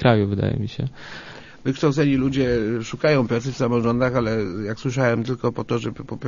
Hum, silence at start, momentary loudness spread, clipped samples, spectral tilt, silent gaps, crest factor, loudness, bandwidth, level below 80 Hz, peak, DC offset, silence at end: none; 0 s; 11 LU; under 0.1%; -7 dB/octave; none; 18 dB; -22 LUFS; 7.4 kHz; -46 dBFS; -2 dBFS; under 0.1%; 0 s